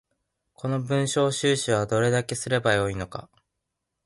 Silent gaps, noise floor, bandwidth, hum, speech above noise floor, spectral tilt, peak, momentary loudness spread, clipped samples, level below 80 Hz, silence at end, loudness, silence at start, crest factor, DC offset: none; -82 dBFS; 11.5 kHz; none; 57 dB; -4.5 dB/octave; -8 dBFS; 12 LU; under 0.1%; -54 dBFS; 0.8 s; -25 LUFS; 0.65 s; 18 dB; under 0.1%